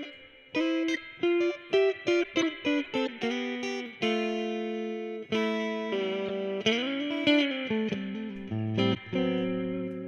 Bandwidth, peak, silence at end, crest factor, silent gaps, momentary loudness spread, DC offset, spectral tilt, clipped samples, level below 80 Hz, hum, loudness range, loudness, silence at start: 8.4 kHz; -12 dBFS; 0 s; 18 dB; none; 8 LU; under 0.1%; -5.5 dB/octave; under 0.1%; -68 dBFS; none; 3 LU; -29 LUFS; 0 s